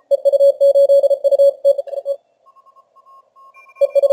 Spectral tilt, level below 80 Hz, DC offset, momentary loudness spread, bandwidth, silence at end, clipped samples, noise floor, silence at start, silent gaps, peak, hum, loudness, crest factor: -1 dB/octave; -82 dBFS; under 0.1%; 13 LU; 12 kHz; 0 s; under 0.1%; -52 dBFS; 0.1 s; none; -4 dBFS; 60 Hz at -80 dBFS; -14 LUFS; 10 dB